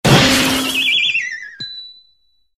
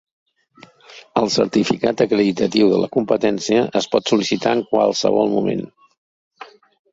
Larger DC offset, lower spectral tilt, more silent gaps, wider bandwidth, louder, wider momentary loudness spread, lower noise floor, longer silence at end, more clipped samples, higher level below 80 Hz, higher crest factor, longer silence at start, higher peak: neither; second, -3.5 dB/octave vs -5 dB/octave; second, none vs 5.98-6.31 s; first, 17 kHz vs 8 kHz; first, -13 LUFS vs -18 LUFS; first, 18 LU vs 5 LU; first, -61 dBFS vs -49 dBFS; first, 0.65 s vs 0.5 s; neither; first, -40 dBFS vs -56 dBFS; about the same, 16 dB vs 16 dB; second, 0.05 s vs 0.9 s; about the same, 0 dBFS vs -2 dBFS